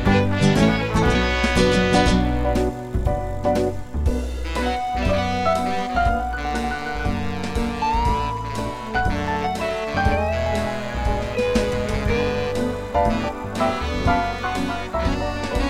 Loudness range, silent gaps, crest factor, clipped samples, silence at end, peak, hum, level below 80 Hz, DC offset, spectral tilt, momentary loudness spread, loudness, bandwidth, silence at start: 4 LU; none; 18 dB; under 0.1%; 0 s; -4 dBFS; none; -28 dBFS; under 0.1%; -6 dB/octave; 8 LU; -22 LUFS; 15.5 kHz; 0 s